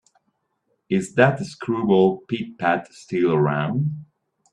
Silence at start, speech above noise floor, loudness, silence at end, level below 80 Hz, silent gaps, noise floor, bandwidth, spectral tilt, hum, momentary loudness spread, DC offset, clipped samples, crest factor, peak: 0.9 s; 51 dB; -22 LUFS; 0.5 s; -62 dBFS; none; -72 dBFS; 10.5 kHz; -7 dB/octave; none; 11 LU; under 0.1%; under 0.1%; 22 dB; 0 dBFS